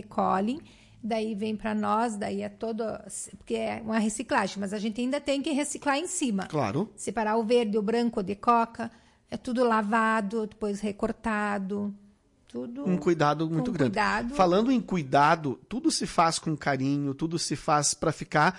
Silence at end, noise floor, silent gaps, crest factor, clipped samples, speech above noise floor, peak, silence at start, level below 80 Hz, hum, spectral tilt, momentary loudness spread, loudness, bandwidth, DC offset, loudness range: 0 s; -59 dBFS; none; 16 dB; under 0.1%; 32 dB; -12 dBFS; 0.05 s; -56 dBFS; none; -4.5 dB/octave; 9 LU; -27 LUFS; 11.5 kHz; under 0.1%; 5 LU